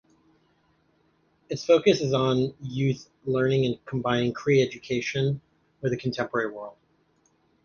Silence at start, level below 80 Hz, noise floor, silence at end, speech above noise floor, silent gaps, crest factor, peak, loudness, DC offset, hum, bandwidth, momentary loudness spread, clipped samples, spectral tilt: 1.5 s; -60 dBFS; -67 dBFS; 0.95 s; 42 dB; none; 20 dB; -6 dBFS; -26 LUFS; under 0.1%; none; 7.2 kHz; 11 LU; under 0.1%; -6 dB/octave